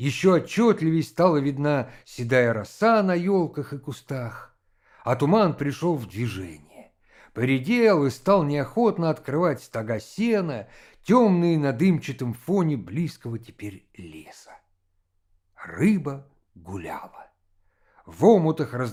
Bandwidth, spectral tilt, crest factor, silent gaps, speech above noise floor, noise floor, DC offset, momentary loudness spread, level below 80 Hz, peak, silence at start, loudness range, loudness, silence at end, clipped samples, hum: 15.5 kHz; -7.5 dB/octave; 20 dB; none; 47 dB; -70 dBFS; under 0.1%; 19 LU; -62 dBFS; -4 dBFS; 0 s; 8 LU; -23 LUFS; 0 s; under 0.1%; none